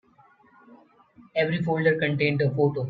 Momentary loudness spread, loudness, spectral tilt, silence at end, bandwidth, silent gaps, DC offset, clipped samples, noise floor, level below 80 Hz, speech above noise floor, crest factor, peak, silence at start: 4 LU; -24 LUFS; -9 dB/octave; 0 s; 5 kHz; none; under 0.1%; under 0.1%; -58 dBFS; -64 dBFS; 35 dB; 18 dB; -8 dBFS; 0.7 s